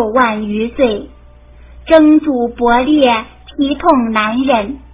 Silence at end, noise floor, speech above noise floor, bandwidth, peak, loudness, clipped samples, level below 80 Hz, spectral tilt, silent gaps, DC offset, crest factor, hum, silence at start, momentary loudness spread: 0.15 s; -39 dBFS; 27 dB; 4 kHz; 0 dBFS; -12 LUFS; 0.3%; -38 dBFS; -9.5 dB/octave; none; under 0.1%; 12 dB; none; 0 s; 9 LU